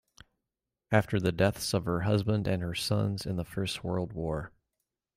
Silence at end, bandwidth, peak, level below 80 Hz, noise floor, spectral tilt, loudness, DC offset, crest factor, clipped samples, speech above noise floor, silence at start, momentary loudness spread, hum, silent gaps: 0.7 s; 16 kHz; -10 dBFS; -54 dBFS; -88 dBFS; -6 dB/octave; -30 LUFS; under 0.1%; 20 dB; under 0.1%; 59 dB; 0.9 s; 7 LU; none; none